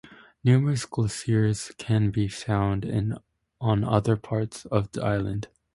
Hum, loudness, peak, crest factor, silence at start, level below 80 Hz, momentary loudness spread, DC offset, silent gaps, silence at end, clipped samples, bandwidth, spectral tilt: none; -26 LUFS; -6 dBFS; 20 dB; 0.05 s; -48 dBFS; 9 LU; under 0.1%; none; 0.3 s; under 0.1%; 11.5 kHz; -7 dB/octave